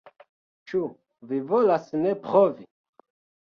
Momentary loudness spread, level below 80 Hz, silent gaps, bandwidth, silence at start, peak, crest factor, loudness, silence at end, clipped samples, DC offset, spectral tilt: 11 LU; -72 dBFS; none; 6.8 kHz; 0.7 s; -6 dBFS; 20 dB; -24 LUFS; 0.8 s; under 0.1%; under 0.1%; -8.5 dB/octave